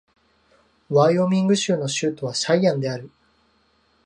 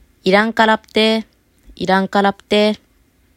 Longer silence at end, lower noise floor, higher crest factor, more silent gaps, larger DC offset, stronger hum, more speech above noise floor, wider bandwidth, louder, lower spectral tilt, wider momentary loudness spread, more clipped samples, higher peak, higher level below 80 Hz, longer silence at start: first, 1 s vs 0.6 s; first, -63 dBFS vs -56 dBFS; about the same, 18 dB vs 16 dB; neither; neither; neither; about the same, 43 dB vs 41 dB; second, 11 kHz vs 14 kHz; second, -21 LUFS vs -16 LUFS; about the same, -5 dB/octave vs -5 dB/octave; about the same, 8 LU vs 6 LU; neither; second, -4 dBFS vs 0 dBFS; second, -66 dBFS vs -52 dBFS; first, 0.9 s vs 0.25 s